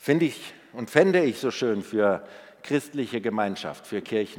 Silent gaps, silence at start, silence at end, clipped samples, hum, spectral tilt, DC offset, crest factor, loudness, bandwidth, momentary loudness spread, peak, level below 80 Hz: none; 0.05 s; 0 s; under 0.1%; none; -5.5 dB/octave; under 0.1%; 24 dB; -25 LUFS; 17 kHz; 17 LU; -2 dBFS; -74 dBFS